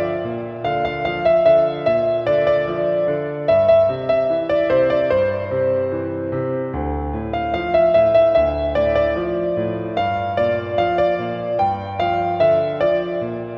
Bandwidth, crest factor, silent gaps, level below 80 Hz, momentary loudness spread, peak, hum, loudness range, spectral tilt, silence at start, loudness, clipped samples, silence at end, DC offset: 5.8 kHz; 14 dB; none; -40 dBFS; 9 LU; -4 dBFS; none; 3 LU; -8.5 dB/octave; 0 s; -19 LUFS; under 0.1%; 0 s; under 0.1%